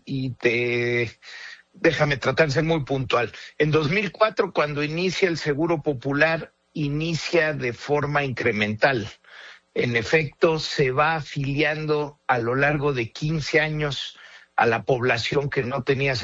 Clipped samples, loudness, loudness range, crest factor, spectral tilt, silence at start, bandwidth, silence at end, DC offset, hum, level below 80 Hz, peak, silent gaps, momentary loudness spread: under 0.1%; -23 LUFS; 1 LU; 18 dB; -5.5 dB/octave; 0.05 s; 7.8 kHz; 0 s; under 0.1%; none; -52 dBFS; -6 dBFS; none; 9 LU